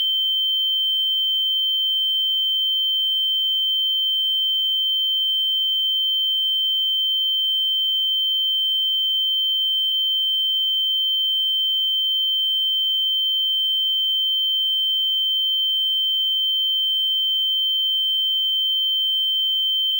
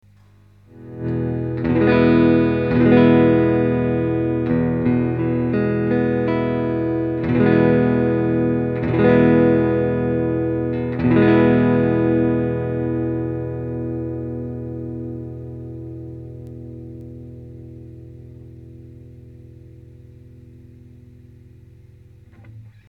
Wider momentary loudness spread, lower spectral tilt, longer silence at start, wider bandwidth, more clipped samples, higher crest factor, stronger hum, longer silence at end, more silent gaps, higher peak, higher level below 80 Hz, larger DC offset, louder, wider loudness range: second, 0 LU vs 21 LU; second, 10 dB/octave vs -11 dB/octave; second, 0 s vs 0.75 s; first, 16 kHz vs 5 kHz; neither; second, 6 dB vs 18 dB; second, none vs 50 Hz at -50 dBFS; second, 0 s vs 0.2 s; neither; second, -14 dBFS vs -2 dBFS; second, under -90 dBFS vs -42 dBFS; neither; about the same, -17 LUFS vs -18 LUFS; second, 0 LU vs 19 LU